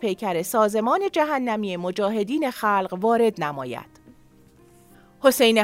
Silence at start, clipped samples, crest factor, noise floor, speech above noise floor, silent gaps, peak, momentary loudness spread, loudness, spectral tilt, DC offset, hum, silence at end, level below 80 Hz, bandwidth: 0 s; under 0.1%; 18 dB; -53 dBFS; 31 dB; none; -4 dBFS; 8 LU; -22 LUFS; -4 dB/octave; under 0.1%; none; 0 s; -64 dBFS; 16 kHz